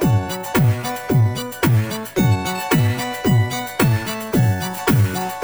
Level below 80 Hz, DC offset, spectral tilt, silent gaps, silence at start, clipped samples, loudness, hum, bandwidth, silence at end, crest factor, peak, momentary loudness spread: -42 dBFS; 0.2%; -6 dB/octave; none; 0 s; under 0.1%; -19 LUFS; none; over 20 kHz; 0 s; 16 dB; -2 dBFS; 4 LU